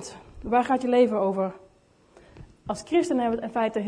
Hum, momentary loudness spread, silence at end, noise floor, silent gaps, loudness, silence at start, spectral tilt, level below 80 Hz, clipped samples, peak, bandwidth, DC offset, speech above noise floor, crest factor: none; 16 LU; 0 s; -59 dBFS; none; -25 LUFS; 0 s; -5.5 dB/octave; -54 dBFS; under 0.1%; -10 dBFS; 10.5 kHz; under 0.1%; 35 dB; 16 dB